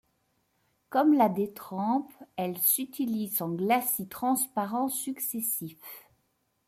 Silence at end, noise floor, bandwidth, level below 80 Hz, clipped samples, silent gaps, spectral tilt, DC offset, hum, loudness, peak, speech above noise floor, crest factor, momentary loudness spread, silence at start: 0.7 s; -75 dBFS; 16 kHz; -76 dBFS; under 0.1%; none; -4.5 dB/octave; under 0.1%; none; -28 LUFS; -10 dBFS; 46 dB; 20 dB; 11 LU; 0.9 s